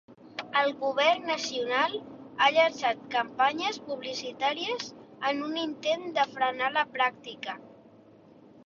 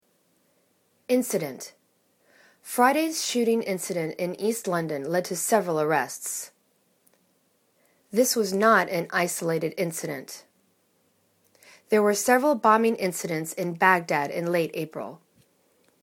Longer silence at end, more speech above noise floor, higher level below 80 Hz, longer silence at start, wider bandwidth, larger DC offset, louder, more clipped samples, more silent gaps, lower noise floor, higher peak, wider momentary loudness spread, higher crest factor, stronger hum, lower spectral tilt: second, 0.05 s vs 0.85 s; second, 26 dB vs 43 dB; about the same, -74 dBFS vs -76 dBFS; second, 0.1 s vs 1.1 s; second, 7.6 kHz vs 19 kHz; neither; second, -28 LUFS vs -25 LUFS; neither; neither; second, -55 dBFS vs -68 dBFS; second, -10 dBFS vs -4 dBFS; about the same, 14 LU vs 14 LU; about the same, 20 dB vs 22 dB; neither; second, -2.5 dB/octave vs -4 dB/octave